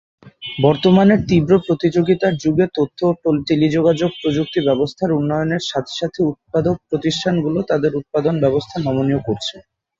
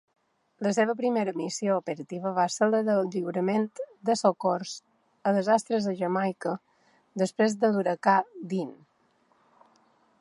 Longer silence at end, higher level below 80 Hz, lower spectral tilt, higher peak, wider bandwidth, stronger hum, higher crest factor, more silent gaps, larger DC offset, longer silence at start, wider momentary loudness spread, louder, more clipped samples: second, 0.4 s vs 1.45 s; first, -48 dBFS vs -80 dBFS; first, -7 dB/octave vs -5.5 dB/octave; first, -2 dBFS vs -8 dBFS; second, 7.6 kHz vs 11.5 kHz; neither; about the same, 16 dB vs 20 dB; neither; neither; second, 0.25 s vs 0.6 s; about the same, 7 LU vs 9 LU; first, -18 LUFS vs -27 LUFS; neither